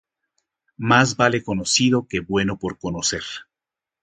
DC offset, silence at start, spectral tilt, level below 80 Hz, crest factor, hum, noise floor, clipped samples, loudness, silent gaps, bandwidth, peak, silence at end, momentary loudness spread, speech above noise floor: under 0.1%; 0.8 s; -3.5 dB/octave; -50 dBFS; 22 dB; none; -88 dBFS; under 0.1%; -20 LUFS; none; 9.6 kHz; 0 dBFS; 0.6 s; 12 LU; 68 dB